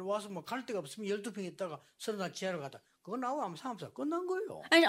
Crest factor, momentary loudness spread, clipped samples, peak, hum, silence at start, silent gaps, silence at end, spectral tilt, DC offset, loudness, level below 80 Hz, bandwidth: 24 dB; 7 LU; under 0.1%; -12 dBFS; none; 0 s; none; 0 s; -4 dB/octave; under 0.1%; -38 LUFS; -86 dBFS; 16 kHz